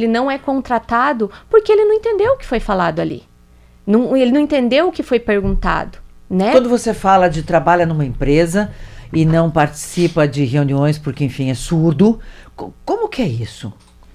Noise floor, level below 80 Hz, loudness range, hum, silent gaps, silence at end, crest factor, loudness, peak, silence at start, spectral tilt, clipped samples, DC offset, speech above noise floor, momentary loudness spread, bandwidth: -46 dBFS; -34 dBFS; 2 LU; none; none; 0.45 s; 16 dB; -16 LUFS; 0 dBFS; 0 s; -6.5 dB/octave; under 0.1%; under 0.1%; 31 dB; 10 LU; 14.5 kHz